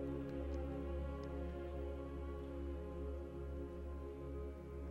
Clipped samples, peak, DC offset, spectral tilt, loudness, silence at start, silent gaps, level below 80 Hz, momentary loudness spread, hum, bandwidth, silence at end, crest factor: under 0.1%; -32 dBFS; under 0.1%; -9 dB/octave; -47 LUFS; 0 s; none; -48 dBFS; 4 LU; none; 6.8 kHz; 0 s; 14 dB